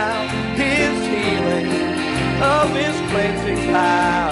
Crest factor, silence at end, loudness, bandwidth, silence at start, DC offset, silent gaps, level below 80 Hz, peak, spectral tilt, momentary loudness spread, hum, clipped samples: 14 dB; 0 s; -18 LUFS; 11.5 kHz; 0 s; under 0.1%; none; -38 dBFS; -4 dBFS; -5 dB/octave; 5 LU; none; under 0.1%